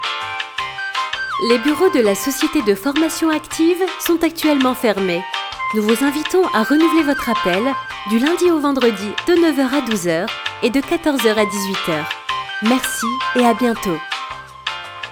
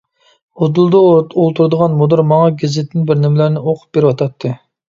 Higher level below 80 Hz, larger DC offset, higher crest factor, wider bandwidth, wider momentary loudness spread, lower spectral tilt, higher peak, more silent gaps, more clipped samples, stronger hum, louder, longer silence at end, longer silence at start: first, -50 dBFS vs -56 dBFS; neither; about the same, 16 dB vs 12 dB; first, over 20 kHz vs 7.4 kHz; about the same, 8 LU vs 9 LU; second, -4 dB/octave vs -8.5 dB/octave; about the same, 0 dBFS vs 0 dBFS; neither; neither; neither; second, -17 LUFS vs -13 LUFS; second, 0 s vs 0.3 s; second, 0 s vs 0.55 s